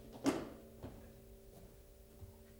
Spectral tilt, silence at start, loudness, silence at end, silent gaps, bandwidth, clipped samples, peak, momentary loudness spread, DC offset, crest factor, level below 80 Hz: -5 dB/octave; 0 s; -44 LUFS; 0 s; none; over 20 kHz; under 0.1%; -22 dBFS; 21 LU; under 0.1%; 24 dB; -62 dBFS